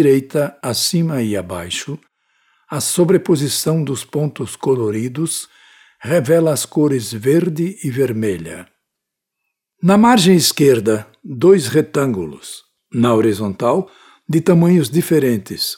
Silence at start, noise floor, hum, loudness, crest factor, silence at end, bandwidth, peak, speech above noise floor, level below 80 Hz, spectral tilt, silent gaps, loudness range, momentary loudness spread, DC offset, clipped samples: 0 s; -80 dBFS; none; -16 LUFS; 16 dB; 0 s; 18 kHz; 0 dBFS; 64 dB; -56 dBFS; -5.5 dB/octave; none; 5 LU; 14 LU; under 0.1%; under 0.1%